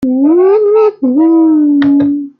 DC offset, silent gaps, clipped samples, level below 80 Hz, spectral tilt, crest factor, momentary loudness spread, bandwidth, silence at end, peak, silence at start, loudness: under 0.1%; none; under 0.1%; -54 dBFS; -9 dB/octave; 6 dB; 3 LU; 5 kHz; 0.1 s; -2 dBFS; 0 s; -9 LUFS